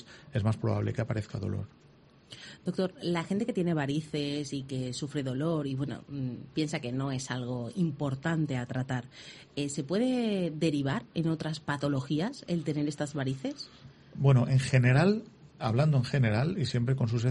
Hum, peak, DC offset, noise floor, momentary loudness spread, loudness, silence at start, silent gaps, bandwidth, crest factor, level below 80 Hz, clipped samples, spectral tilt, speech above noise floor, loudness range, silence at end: none; -10 dBFS; under 0.1%; -53 dBFS; 11 LU; -31 LUFS; 0 s; none; 11.5 kHz; 20 dB; -60 dBFS; under 0.1%; -6.5 dB/octave; 23 dB; 6 LU; 0 s